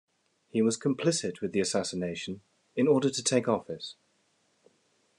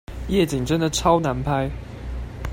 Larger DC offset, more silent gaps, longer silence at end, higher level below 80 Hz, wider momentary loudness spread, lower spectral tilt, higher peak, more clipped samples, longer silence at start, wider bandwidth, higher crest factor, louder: neither; neither; first, 1.25 s vs 0 s; second, -74 dBFS vs -34 dBFS; about the same, 14 LU vs 14 LU; about the same, -4.5 dB/octave vs -5.5 dB/octave; second, -12 dBFS vs -4 dBFS; neither; first, 0.55 s vs 0.1 s; second, 12 kHz vs 16.5 kHz; about the same, 18 dB vs 18 dB; second, -29 LUFS vs -22 LUFS